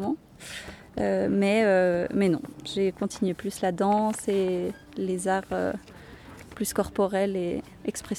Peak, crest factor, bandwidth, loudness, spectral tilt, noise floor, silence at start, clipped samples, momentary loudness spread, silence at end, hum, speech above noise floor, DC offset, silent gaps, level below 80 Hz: -12 dBFS; 14 dB; 16 kHz; -27 LUFS; -5.5 dB/octave; -46 dBFS; 0 s; under 0.1%; 16 LU; 0 s; none; 20 dB; under 0.1%; none; -54 dBFS